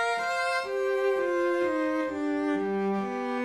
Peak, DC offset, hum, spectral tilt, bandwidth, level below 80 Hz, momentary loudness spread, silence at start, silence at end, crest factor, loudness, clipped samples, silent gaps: -18 dBFS; under 0.1%; none; -5.5 dB/octave; 13 kHz; -70 dBFS; 3 LU; 0 s; 0 s; 10 dB; -28 LUFS; under 0.1%; none